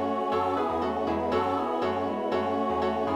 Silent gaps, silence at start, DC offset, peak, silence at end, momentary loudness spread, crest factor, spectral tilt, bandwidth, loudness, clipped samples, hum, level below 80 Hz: none; 0 s; under 0.1%; -14 dBFS; 0 s; 2 LU; 12 dB; -6.5 dB/octave; 15 kHz; -28 LUFS; under 0.1%; none; -54 dBFS